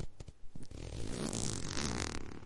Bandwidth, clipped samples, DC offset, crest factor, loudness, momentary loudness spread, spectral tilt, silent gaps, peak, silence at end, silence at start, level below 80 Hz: 11.5 kHz; under 0.1%; under 0.1%; 22 dB; -40 LUFS; 17 LU; -3.5 dB/octave; none; -18 dBFS; 0 s; 0 s; -48 dBFS